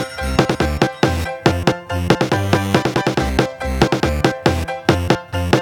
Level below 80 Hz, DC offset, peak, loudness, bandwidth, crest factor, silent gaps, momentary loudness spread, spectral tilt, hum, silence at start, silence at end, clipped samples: -30 dBFS; under 0.1%; 0 dBFS; -18 LUFS; 19.5 kHz; 18 dB; none; 3 LU; -5.5 dB/octave; none; 0 s; 0 s; under 0.1%